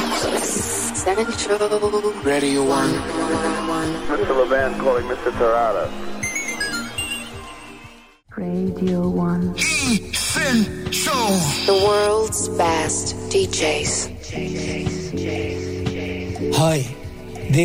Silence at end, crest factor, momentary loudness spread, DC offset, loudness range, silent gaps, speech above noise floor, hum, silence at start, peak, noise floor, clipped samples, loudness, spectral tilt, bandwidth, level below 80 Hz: 0 s; 14 dB; 9 LU; under 0.1%; 5 LU; none; 24 dB; none; 0 s; -6 dBFS; -44 dBFS; under 0.1%; -20 LUFS; -4 dB/octave; 16 kHz; -40 dBFS